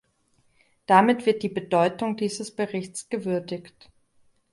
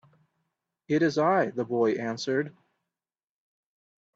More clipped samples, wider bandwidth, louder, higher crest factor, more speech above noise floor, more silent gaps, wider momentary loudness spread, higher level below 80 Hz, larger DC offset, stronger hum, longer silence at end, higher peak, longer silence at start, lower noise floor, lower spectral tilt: neither; first, 11.5 kHz vs 7.8 kHz; first, -24 LUFS vs -27 LUFS; about the same, 22 dB vs 18 dB; second, 43 dB vs over 64 dB; neither; first, 14 LU vs 7 LU; first, -68 dBFS vs -74 dBFS; neither; neither; second, 0.9 s vs 1.65 s; first, -4 dBFS vs -12 dBFS; about the same, 0.9 s vs 0.9 s; second, -67 dBFS vs under -90 dBFS; about the same, -5.5 dB/octave vs -6 dB/octave